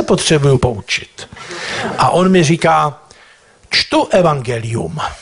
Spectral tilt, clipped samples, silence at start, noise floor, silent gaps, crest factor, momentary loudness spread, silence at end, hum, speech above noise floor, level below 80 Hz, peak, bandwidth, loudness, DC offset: -5 dB/octave; under 0.1%; 0 s; -46 dBFS; none; 14 dB; 11 LU; 0 s; none; 32 dB; -40 dBFS; -2 dBFS; 11 kHz; -14 LUFS; under 0.1%